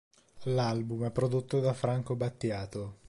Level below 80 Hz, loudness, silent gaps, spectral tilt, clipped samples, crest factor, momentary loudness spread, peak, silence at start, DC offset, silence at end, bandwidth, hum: -60 dBFS; -32 LUFS; none; -7.5 dB/octave; under 0.1%; 16 dB; 7 LU; -16 dBFS; 0.35 s; under 0.1%; 0 s; 11.5 kHz; none